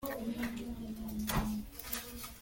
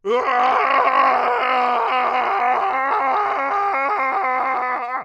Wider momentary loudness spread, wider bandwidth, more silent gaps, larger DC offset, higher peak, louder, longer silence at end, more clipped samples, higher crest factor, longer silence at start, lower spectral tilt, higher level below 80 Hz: first, 7 LU vs 4 LU; first, 17 kHz vs 8 kHz; neither; neither; second, -20 dBFS vs -2 dBFS; second, -39 LUFS vs -18 LUFS; about the same, 0 s vs 0 s; neither; about the same, 20 dB vs 16 dB; about the same, 0 s vs 0.05 s; first, -4.5 dB/octave vs -3 dB/octave; first, -48 dBFS vs -64 dBFS